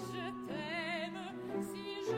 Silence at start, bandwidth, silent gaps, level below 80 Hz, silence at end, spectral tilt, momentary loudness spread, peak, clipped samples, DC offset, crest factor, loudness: 0 s; 16.5 kHz; none; -74 dBFS; 0 s; -5 dB/octave; 4 LU; -26 dBFS; under 0.1%; under 0.1%; 14 dB; -41 LUFS